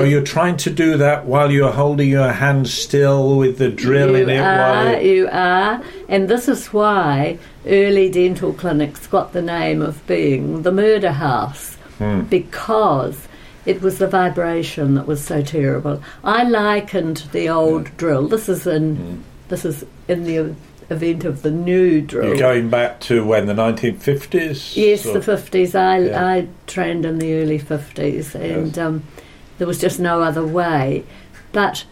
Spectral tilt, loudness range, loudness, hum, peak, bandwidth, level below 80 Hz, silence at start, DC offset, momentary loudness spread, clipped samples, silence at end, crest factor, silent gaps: -6 dB/octave; 6 LU; -17 LUFS; none; -4 dBFS; 16.5 kHz; -44 dBFS; 0 s; under 0.1%; 9 LU; under 0.1%; 0.1 s; 12 dB; none